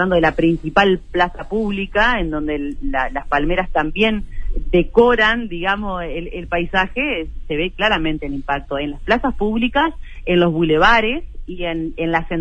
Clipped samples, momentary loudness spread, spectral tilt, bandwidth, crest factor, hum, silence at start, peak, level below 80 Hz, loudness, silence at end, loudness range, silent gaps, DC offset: under 0.1%; 11 LU; -6.5 dB/octave; 8.2 kHz; 18 dB; none; 0 s; 0 dBFS; -28 dBFS; -18 LUFS; 0 s; 3 LU; none; under 0.1%